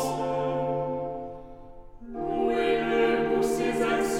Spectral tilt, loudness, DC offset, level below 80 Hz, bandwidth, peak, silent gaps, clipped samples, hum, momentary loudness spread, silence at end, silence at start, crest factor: -5 dB/octave; -27 LUFS; under 0.1%; -48 dBFS; 16.5 kHz; -12 dBFS; none; under 0.1%; none; 16 LU; 0 s; 0 s; 14 dB